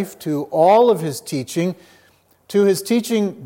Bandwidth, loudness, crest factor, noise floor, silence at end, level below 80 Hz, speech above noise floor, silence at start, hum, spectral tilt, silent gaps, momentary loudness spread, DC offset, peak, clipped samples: 17 kHz; -18 LUFS; 16 dB; -56 dBFS; 0 s; -70 dBFS; 38 dB; 0 s; none; -5.5 dB/octave; none; 12 LU; under 0.1%; -4 dBFS; under 0.1%